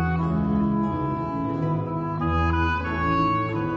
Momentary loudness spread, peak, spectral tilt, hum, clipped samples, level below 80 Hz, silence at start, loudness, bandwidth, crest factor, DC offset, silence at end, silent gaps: 5 LU; -10 dBFS; -9 dB/octave; none; under 0.1%; -36 dBFS; 0 s; -24 LUFS; 6.6 kHz; 12 dB; under 0.1%; 0 s; none